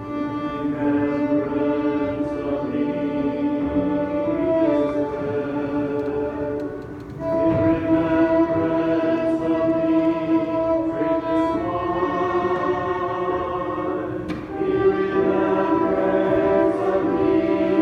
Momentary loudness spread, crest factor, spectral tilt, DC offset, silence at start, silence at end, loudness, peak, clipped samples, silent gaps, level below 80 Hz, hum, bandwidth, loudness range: 7 LU; 14 dB; -8.5 dB/octave; under 0.1%; 0 s; 0 s; -22 LUFS; -8 dBFS; under 0.1%; none; -46 dBFS; none; 6.4 kHz; 3 LU